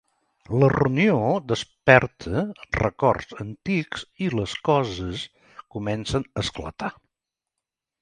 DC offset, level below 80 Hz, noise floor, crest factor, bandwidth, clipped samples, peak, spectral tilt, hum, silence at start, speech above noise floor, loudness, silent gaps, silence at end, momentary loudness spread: under 0.1%; -46 dBFS; -86 dBFS; 24 dB; 10.5 kHz; under 0.1%; 0 dBFS; -6 dB/octave; none; 0.5 s; 63 dB; -23 LUFS; none; 1.1 s; 15 LU